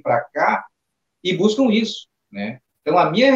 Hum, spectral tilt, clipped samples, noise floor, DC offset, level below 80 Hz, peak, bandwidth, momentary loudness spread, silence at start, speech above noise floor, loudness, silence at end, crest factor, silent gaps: none; -5.5 dB/octave; under 0.1%; -77 dBFS; under 0.1%; -68 dBFS; -2 dBFS; 8 kHz; 14 LU; 0.05 s; 59 dB; -20 LUFS; 0 s; 18 dB; none